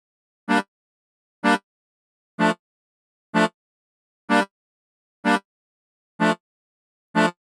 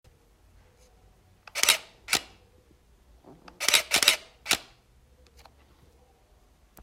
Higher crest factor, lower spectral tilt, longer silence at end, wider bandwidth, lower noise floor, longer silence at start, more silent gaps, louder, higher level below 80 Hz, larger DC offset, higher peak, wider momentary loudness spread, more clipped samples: second, 24 dB vs 30 dB; first, -5 dB/octave vs 1 dB/octave; second, 0.3 s vs 2.2 s; second, 13 kHz vs 16.5 kHz; first, under -90 dBFS vs -61 dBFS; second, 0.5 s vs 1.55 s; first, 0.68-1.42 s, 1.63-2.38 s, 2.59-3.33 s, 3.54-4.28 s, 4.51-5.23 s, 5.45-6.19 s, 6.40-7.14 s vs none; about the same, -23 LUFS vs -24 LUFS; second, -82 dBFS vs -60 dBFS; neither; about the same, -2 dBFS vs -2 dBFS; about the same, 9 LU vs 8 LU; neither